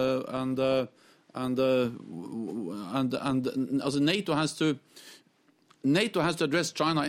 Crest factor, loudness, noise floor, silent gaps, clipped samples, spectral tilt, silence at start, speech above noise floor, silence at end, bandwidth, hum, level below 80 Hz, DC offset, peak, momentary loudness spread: 18 dB; -29 LUFS; -66 dBFS; none; under 0.1%; -5 dB/octave; 0 s; 37 dB; 0 s; 16 kHz; none; -66 dBFS; under 0.1%; -12 dBFS; 12 LU